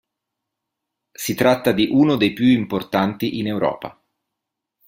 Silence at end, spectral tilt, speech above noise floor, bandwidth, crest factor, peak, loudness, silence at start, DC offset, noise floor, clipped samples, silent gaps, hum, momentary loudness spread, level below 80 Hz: 0.95 s; -5.5 dB/octave; 64 dB; 16.5 kHz; 18 dB; -2 dBFS; -19 LUFS; 1.2 s; under 0.1%; -82 dBFS; under 0.1%; none; none; 10 LU; -56 dBFS